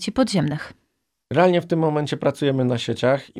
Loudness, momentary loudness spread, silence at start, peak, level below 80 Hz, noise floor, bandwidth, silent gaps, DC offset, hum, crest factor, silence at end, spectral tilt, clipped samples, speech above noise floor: -21 LUFS; 8 LU; 0 s; -4 dBFS; -56 dBFS; -73 dBFS; 13.5 kHz; none; under 0.1%; none; 18 dB; 0 s; -6.5 dB/octave; under 0.1%; 52 dB